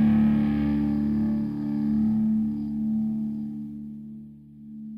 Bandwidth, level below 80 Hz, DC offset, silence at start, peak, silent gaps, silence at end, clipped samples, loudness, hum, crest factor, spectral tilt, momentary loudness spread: 5 kHz; -46 dBFS; under 0.1%; 0 s; -12 dBFS; none; 0 s; under 0.1%; -25 LUFS; none; 12 dB; -10 dB/octave; 19 LU